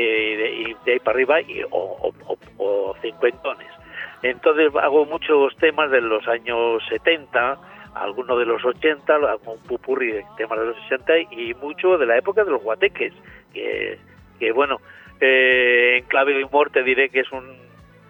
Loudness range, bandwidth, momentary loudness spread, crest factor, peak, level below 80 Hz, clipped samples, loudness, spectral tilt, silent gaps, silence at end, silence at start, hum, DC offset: 5 LU; 4.2 kHz; 13 LU; 18 dB; -4 dBFS; -58 dBFS; under 0.1%; -20 LUFS; -6 dB/octave; none; 0.55 s; 0 s; none; under 0.1%